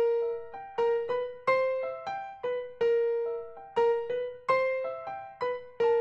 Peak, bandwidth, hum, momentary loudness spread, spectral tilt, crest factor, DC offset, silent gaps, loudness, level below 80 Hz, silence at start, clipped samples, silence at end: -14 dBFS; 6.6 kHz; none; 10 LU; -4.5 dB/octave; 16 dB; under 0.1%; none; -30 LUFS; -70 dBFS; 0 s; under 0.1%; 0 s